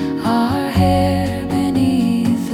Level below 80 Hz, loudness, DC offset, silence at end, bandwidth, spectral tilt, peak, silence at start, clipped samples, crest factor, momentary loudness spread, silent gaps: -36 dBFS; -17 LUFS; under 0.1%; 0 s; 16.5 kHz; -7 dB/octave; -4 dBFS; 0 s; under 0.1%; 12 dB; 4 LU; none